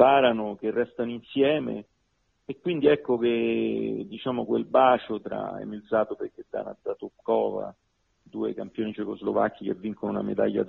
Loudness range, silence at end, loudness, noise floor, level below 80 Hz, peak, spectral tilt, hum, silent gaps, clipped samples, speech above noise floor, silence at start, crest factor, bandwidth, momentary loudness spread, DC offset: 6 LU; 0 s; -27 LUFS; -72 dBFS; -66 dBFS; -4 dBFS; -9 dB/octave; none; none; under 0.1%; 46 dB; 0 s; 22 dB; 4.2 kHz; 14 LU; under 0.1%